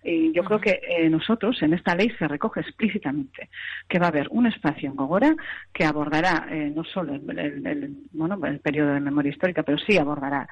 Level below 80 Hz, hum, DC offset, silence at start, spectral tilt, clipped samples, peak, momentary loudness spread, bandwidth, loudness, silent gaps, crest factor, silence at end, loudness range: -56 dBFS; none; under 0.1%; 0.05 s; -7 dB/octave; under 0.1%; -8 dBFS; 9 LU; 8.6 kHz; -24 LUFS; none; 16 dB; 0 s; 3 LU